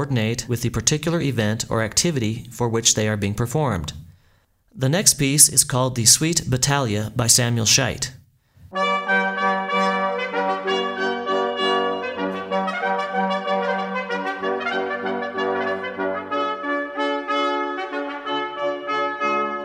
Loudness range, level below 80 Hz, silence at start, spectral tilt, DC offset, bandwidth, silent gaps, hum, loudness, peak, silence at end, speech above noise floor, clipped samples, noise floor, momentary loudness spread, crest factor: 8 LU; -48 dBFS; 0 s; -3 dB/octave; under 0.1%; 16 kHz; none; none; -20 LUFS; 0 dBFS; 0 s; 40 dB; under 0.1%; -60 dBFS; 10 LU; 22 dB